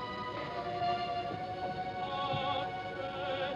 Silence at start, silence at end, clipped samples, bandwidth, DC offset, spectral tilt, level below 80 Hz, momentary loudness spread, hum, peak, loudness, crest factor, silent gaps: 0 s; 0 s; under 0.1%; 9.2 kHz; under 0.1%; -6 dB/octave; -62 dBFS; 5 LU; none; -22 dBFS; -36 LUFS; 16 dB; none